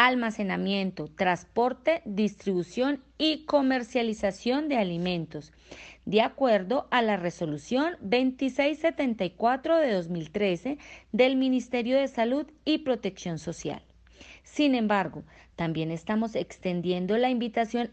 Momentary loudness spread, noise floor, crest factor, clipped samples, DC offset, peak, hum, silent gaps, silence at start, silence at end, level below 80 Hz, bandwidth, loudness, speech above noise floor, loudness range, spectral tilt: 10 LU; -52 dBFS; 20 dB; under 0.1%; under 0.1%; -6 dBFS; none; none; 0 s; 0 s; -60 dBFS; 8.6 kHz; -28 LUFS; 24 dB; 3 LU; -5.5 dB/octave